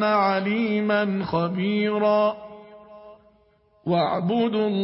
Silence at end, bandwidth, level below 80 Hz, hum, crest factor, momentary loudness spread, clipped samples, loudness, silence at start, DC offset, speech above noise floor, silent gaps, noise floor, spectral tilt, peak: 0 s; 5.8 kHz; -62 dBFS; none; 16 dB; 5 LU; under 0.1%; -23 LUFS; 0 s; under 0.1%; 38 dB; none; -60 dBFS; -11 dB/octave; -8 dBFS